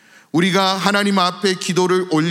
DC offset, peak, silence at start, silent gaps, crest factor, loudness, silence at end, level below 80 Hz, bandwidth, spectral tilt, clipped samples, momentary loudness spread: under 0.1%; 0 dBFS; 0.35 s; none; 16 dB; -17 LUFS; 0 s; -72 dBFS; 16 kHz; -4.5 dB/octave; under 0.1%; 3 LU